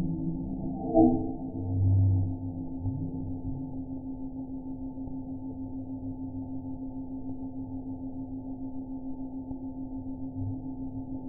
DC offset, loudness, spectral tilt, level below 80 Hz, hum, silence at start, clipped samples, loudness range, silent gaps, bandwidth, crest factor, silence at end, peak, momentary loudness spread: under 0.1%; -33 LUFS; -16.5 dB/octave; -46 dBFS; none; 0 s; under 0.1%; 10 LU; none; 0.9 kHz; 22 dB; 0 s; -8 dBFS; 14 LU